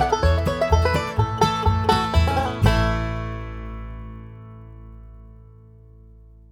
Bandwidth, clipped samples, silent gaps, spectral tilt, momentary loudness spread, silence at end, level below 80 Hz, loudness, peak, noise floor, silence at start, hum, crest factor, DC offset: 16 kHz; under 0.1%; none; -6 dB/octave; 22 LU; 1.15 s; -30 dBFS; -21 LUFS; -4 dBFS; -47 dBFS; 0 s; none; 18 dB; under 0.1%